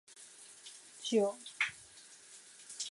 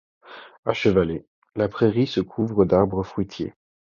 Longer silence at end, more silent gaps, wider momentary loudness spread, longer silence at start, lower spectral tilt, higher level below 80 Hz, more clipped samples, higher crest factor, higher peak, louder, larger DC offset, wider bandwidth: second, 0 s vs 0.45 s; second, none vs 0.58-0.63 s, 1.27-1.42 s; first, 21 LU vs 15 LU; second, 0.1 s vs 0.3 s; second, -2.5 dB/octave vs -8 dB/octave; second, -84 dBFS vs -46 dBFS; neither; about the same, 20 dB vs 20 dB; second, -20 dBFS vs -4 dBFS; second, -36 LUFS vs -23 LUFS; neither; first, 11.5 kHz vs 7.2 kHz